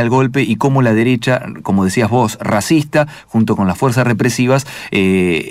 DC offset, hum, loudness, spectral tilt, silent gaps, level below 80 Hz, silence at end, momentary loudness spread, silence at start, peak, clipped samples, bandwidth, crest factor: under 0.1%; none; -14 LUFS; -6 dB/octave; none; -48 dBFS; 0 s; 4 LU; 0 s; -2 dBFS; under 0.1%; 16 kHz; 12 dB